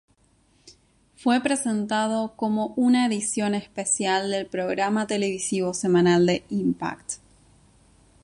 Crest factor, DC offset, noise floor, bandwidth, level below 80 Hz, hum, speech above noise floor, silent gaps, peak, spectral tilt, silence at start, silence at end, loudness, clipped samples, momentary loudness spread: 16 dB; under 0.1%; -62 dBFS; 11.5 kHz; -62 dBFS; none; 39 dB; none; -8 dBFS; -4.5 dB/octave; 0.65 s; 1.1 s; -24 LUFS; under 0.1%; 7 LU